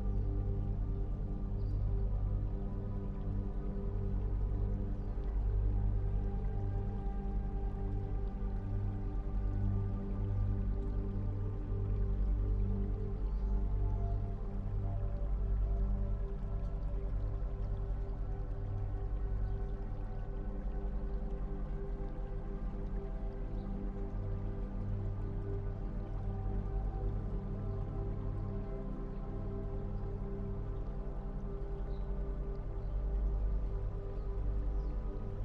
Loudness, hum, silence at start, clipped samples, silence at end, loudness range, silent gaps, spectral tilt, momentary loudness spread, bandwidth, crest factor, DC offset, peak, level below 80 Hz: -40 LUFS; 50 Hz at -45 dBFS; 0 s; under 0.1%; 0 s; 5 LU; none; -10.5 dB/octave; 6 LU; 2.9 kHz; 12 dB; under 0.1%; -24 dBFS; -36 dBFS